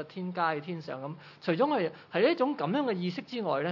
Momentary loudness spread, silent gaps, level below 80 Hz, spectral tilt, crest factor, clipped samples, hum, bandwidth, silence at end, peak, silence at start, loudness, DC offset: 11 LU; none; -86 dBFS; -8 dB/octave; 16 dB; under 0.1%; none; 6 kHz; 0 s; -14 dBFS; 0 s; -31 LUFS; under 0.1%